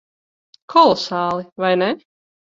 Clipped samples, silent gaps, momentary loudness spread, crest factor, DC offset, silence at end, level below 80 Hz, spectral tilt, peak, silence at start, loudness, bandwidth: under 0.1%; 1.52-1.56 s; 9 LU; 20 dB; under 0.1%; 0.55 s; -62 dBFS; -5.5 dB/octave; 0 dBFS; 0.7 s; -17 LUFS; 7.6 kHz